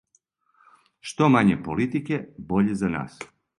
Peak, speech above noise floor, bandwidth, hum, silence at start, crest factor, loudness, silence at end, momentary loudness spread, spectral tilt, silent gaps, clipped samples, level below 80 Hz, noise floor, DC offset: -4 dBFS; 44 dB; 11.5 kHz; none; 1.05 s; 20 dB; -23 LUFS; 0.35 s; 19 LU; -7 dB/octave; none; under 0.1%; -54 dBFS; -67 dBFS; under 0.1%